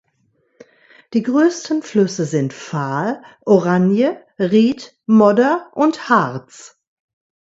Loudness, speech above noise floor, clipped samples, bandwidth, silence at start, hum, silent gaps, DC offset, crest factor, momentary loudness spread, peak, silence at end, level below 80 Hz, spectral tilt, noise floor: -17 LUFS; 47 dB; under 0.1%; 8 kHz; 1.1 s; none; none; under 0.1%; 18 dB; 11 LU; 0 dBFS; 0.75 s; -64 dBFS; -6.5 dB/octave; -63 dBFS